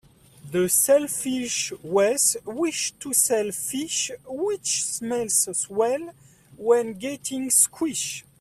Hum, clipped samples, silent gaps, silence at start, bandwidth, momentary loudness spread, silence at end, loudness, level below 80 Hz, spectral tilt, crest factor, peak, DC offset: none; under 0.1%; none; 0.45 s; 16 kHz; 11 LU; 0.2 s; -23 LUFS; -64 dBFS; -2 dB/octave; 20 dB; -4 dBFS; under 0.1%